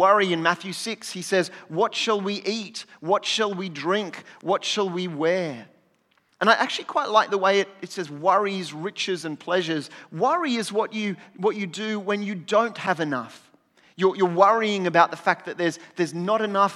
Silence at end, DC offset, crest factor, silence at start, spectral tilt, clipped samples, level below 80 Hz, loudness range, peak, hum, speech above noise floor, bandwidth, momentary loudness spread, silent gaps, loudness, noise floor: 0 s; under 0.1%; 22 dB; 0 s; -4 dB/octave; under 0.1%; -88 dBFS; 4 LU; -2 dBFS; none; 42 dB; 13.5 kHz; 11 LU; none; -24 LUFS; -66 dBFS